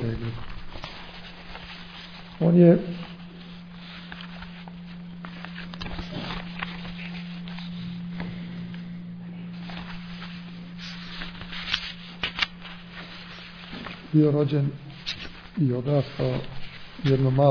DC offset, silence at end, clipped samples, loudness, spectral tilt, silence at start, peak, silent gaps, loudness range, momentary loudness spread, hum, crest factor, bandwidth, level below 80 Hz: under 0.1%; 0 s; under 0.1%; -28 LUFS; -8 dB/octave; 0 s; -4 dBFS; none; 12 LU; 19 LU; none; 24 dB; 5.4 kHz; -48 dBFS